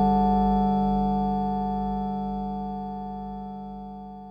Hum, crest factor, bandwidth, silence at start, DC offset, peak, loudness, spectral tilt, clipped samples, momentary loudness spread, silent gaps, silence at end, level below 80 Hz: 50 Hz at -40 dBFS; 14 dB; 5.2 kHz; 0 s; under 0.1%; -12 dBFS; -26 LUFS; -10.5 dB/octave; under 0.1%; 16 LU; none; 0 s; -38 dBFS